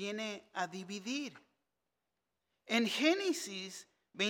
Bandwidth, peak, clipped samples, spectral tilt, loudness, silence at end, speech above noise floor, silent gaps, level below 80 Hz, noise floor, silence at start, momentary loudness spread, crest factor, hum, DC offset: 17.5 kHz; -18 dBFS; under 0.1%; -3 dB/octave; -36 LUFS; 0 s; 51 dB; none; -90 dBFS; -88 dBFS; 0 s; 16 LU; 20 dB; none; under 0.1%